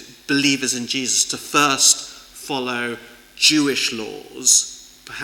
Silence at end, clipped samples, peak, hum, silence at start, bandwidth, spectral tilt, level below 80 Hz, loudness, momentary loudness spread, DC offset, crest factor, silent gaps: 0 s; under 0.1%; -2 dBFS; none; 0 s; 19 kHz; -1 dB/octave; -60 dBFS; -17 LUFS; 19 LU; under 0.1%; 18 dB; none